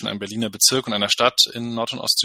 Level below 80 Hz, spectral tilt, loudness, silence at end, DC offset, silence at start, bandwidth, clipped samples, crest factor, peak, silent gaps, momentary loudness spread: -60 dBFS; -1.5 dB/octave; -19 LUFS; 0 s; under 0.1%; 0 s; 16.5 kHz; under 0.1%; 20 dB; 0 dBFS; none; 10 LU